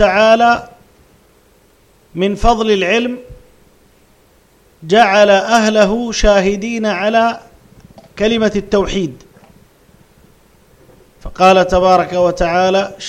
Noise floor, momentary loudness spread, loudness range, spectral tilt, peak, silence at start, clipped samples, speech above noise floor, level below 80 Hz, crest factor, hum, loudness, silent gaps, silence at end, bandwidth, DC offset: -50 dBFS; 9 LU; 7 LU; -4.5 dB/octave; 0 dBFS; 0 s; under 0.1%; 38 dB; -32 dBFS; 14 dB; none; -13 LUFS; none; 0 s; 13.5 kHz; under 0.1%